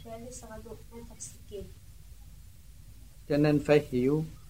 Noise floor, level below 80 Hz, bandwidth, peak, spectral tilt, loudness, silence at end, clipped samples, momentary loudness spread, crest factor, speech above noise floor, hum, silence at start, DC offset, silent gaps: -52 dBFS; -52 dBFS; 16 kHz; -10 dBFS; -6.5 dB/octave; -27 LUFS; 0.1 s; under 0.1%; 22 LU; 22 dB; 21 dB; none; 0.05 s; 0.2%; none